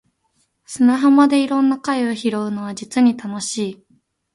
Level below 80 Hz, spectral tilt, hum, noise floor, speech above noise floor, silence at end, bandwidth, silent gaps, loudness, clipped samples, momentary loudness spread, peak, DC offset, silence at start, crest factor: -66 dBFS; -4.5 dB/octave; none; -66 dBFS; 49 dB; 0.6 s; 11.5 kHz; none; -18 LUFS; under 0.1%; 12 LU; -2 dBFS; under 0.1%; 0.7 s; 16 dB